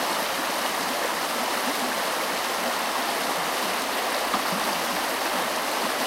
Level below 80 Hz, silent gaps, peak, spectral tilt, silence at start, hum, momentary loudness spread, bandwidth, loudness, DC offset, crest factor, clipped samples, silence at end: -64 dBFS; none; -12 dBFS; -1 dB/octave; 0 s; none; 1 LU; 16 kHz; -25 LUFS; under 0.1%; 14 dB; under 0.1%; 0 s